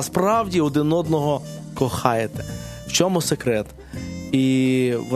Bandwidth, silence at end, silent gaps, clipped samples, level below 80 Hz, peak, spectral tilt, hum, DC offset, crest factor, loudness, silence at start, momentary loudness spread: 14 kHz; 0 s; none; under 0.1%; -46 dBFS; 0 dBFS; -5 dB/octave; none; under 0.1%; 22 dB; -21 LUFS; 0 s; 14 LU